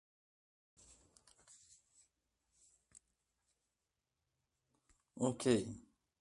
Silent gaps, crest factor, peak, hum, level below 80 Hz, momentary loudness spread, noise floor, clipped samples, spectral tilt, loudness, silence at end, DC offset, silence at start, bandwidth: none; 26 dB; -20 dBFS; none; -76 dBFS; 27 LU; -90 dBFS; under 0.1%; -5.5 dB/octave; -38 LUFS; 0.4 s; under 0.1%; 5.15 s; 11.5 kHz